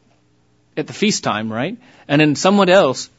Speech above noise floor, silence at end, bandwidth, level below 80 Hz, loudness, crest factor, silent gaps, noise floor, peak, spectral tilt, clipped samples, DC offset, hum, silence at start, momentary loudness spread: 42 dB; 0.15 s; 8 kHz; -62 dBFS; -16 LUFS; 18 dB; none; -58 dBFS; 0 dBFS; -4.5 dB/octave; under 0.1%; under 0.1%; none; 0.75 s; 16 LU